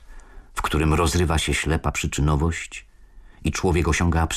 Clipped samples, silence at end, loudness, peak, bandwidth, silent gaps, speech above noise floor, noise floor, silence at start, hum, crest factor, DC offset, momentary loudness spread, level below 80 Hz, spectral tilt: under 0.1%; 0 s; -22 LUFS; -10 dBFS; 14.5 kHz; none; 25 dB; -46 dBFS; 0.1 s; none; 12 dB; under 0.1%; 10 LU; -32 dBFS; -5 dB/octave